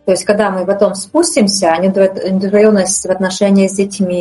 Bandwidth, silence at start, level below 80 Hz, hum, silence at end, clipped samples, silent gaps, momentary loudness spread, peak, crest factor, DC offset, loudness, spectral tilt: 11.5 kHz; 0.05 s; -52 dBFS; none; 0 s; under 0.1%; none; 5 LU; 0 dBFS; 12 dB; under 0.1%; -12 LUFS; -4.5 dB/octave